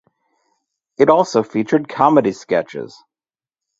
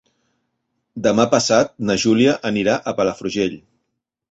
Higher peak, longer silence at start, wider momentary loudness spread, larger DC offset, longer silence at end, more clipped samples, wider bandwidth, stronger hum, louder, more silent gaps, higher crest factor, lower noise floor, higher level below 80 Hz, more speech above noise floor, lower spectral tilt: about the same, 0 dBFS vs -2 dBFS; about the same, 1 s vs 0.95 s; first, 15 LU vs 7 LU; neither; first, 0.9 s vs 0.7 s; neither; about the same, 8 kHz vs 8.2 kHz; neither; about the same, -16 LUFS vs -18 LUFS; neither; about the same, 18 dB vs 18 dB; first, under -90 dBFS vs -77 dBFS; second, -62 dBFS vs -54 dBFS; first, over 74 dB vs 59 dB; first, -6 dB/octave vs -4.5 dB/octave